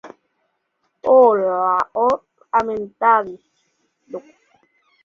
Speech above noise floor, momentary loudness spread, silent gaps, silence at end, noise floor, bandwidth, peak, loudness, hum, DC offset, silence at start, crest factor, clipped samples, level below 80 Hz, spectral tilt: 54 dB; 23 LU; none; 0.85 s; -70 dBFS; 7 kHz; -2 dBFS; -17 LUFS; none; under 0.1%; 0.05 s; 18 dB; under 0.1%; -62 dBFS; -6.5 dB/octave